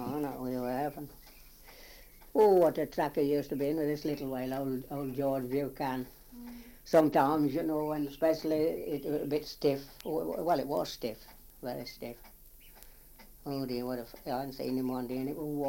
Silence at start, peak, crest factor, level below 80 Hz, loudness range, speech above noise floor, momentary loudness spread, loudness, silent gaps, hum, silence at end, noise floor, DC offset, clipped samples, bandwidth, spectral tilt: 0 s; -12 dBFS; 20 dB; -58 dBFS; 9 LU; 23 dB; 19 LU; -32 LUFS; none; none; 0 s; -55 dBFS; under 0.1%; under 0.1%; 17 kHz; -6.5 dB/octave